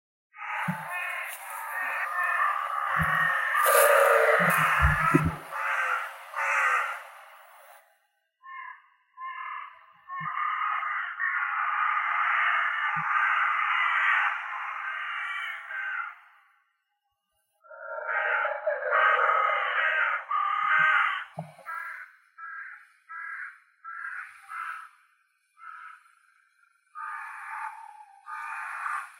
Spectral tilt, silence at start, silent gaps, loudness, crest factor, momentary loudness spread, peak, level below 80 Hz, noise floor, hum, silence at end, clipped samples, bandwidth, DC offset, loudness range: -4 dB/octave; 0.35 s; none; -26 LUFS; 22 dB; 20 LU; -8 dBFS; -50 dBFS; -79 dBFS; none; 0.05 s; under 0.1%; 16 kHz; under 0.1%; 18 LU